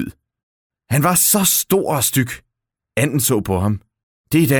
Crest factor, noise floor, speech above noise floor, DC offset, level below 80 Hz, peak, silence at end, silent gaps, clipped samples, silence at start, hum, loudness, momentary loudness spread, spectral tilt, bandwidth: 18 dB; -73 dBFS; 57 dB; under 0.1%; -48 dBFS; -2 dBFS; 0 s; 0.43-0.70 s, 4.03-4.24 s; under 0.1%; 0 s; none; -16 LUFS; 14 LU; -4 dB/octave; over 20 kHz